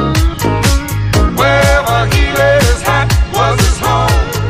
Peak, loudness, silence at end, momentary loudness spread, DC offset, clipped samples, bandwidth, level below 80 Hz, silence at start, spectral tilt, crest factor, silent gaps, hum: 0 dBFS; -11 LUFS; 0 s; 4 LU; under 0.1%; under 0.1%; 15.5 kHz; -16 dBFS; 0 s; -5 dB/octave; 10 dB; none; none